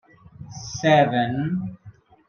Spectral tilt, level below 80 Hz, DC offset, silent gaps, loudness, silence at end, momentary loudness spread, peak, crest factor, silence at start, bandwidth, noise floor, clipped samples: -5.5 dB/octave; -56 dBFS; under 0.1%; none; -21 LUFS; 0.4 s; 19 LU; -4 dBFS; 20 dB; 0.4 s; 7 kHz; -48 dBFS; under 0.1%